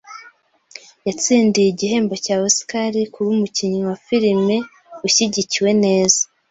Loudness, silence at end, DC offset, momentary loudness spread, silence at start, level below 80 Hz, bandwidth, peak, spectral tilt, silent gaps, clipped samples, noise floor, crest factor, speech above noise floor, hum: -17 LUFS; 0.25 s; under 0.1%; 8 LU; 0.05 s; -60 dBFS; 8.2 kHz; 0 dBFS; -3.5 dB/octave; none; under 0.1%; -49 dBFS; 18 dB; 32 dB; none